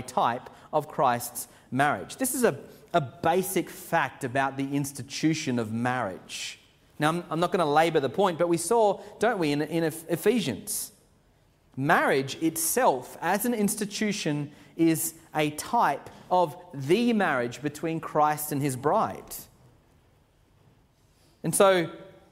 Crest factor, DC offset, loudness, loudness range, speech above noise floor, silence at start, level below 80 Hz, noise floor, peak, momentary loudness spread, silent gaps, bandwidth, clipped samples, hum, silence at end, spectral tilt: 22 dB; under 0.1%; -27 LUFS; 4 LU; 36 dB; 0 s; -64 dBFS; -63 dBFS; -6 dBFS; 11 LU; none; 16 kHz; under 0.1%; none; 0.2 s; -4.5 dB/octave